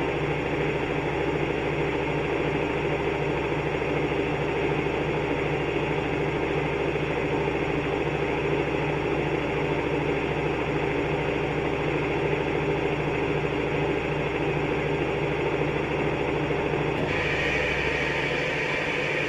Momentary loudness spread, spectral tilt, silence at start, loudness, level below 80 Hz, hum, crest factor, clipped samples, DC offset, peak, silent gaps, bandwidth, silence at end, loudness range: 2 LU; -6.5 dB/octave; 0 s; -26 LUFS; -42 dBFS; none; 14 dB; under 0.1%; under 0.1%; -12 dBFS; none; 11 kHz; 0 s; 1 LU